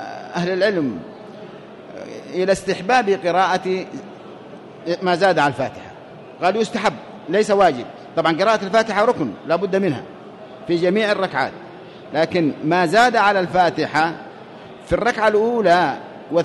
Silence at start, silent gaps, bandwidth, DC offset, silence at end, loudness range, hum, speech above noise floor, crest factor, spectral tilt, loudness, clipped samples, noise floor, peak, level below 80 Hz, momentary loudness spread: 0 s; none; 11.5 kHz; under 0.1%; 0 s; 4 LU; none; 21 dB; 16 dB; -5 dB/octave; -19 LUFS; under 0.1%; -39 dBFS; -4 dBFS; -54 dBFS; 22 LU